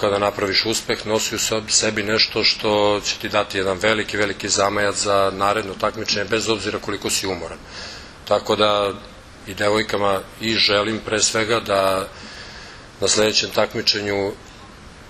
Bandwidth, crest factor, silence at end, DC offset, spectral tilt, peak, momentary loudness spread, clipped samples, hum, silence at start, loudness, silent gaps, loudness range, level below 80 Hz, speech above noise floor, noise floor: 14 kHz; 20 dB; 0 s; under 0.1%; -2.5 dB/octave; 0 dBFS; 16 LU; under 0.1%; none; 0 s; -19 LUFS; none; 4 LU; -48 dBFS; 21 dB; -41 dBFS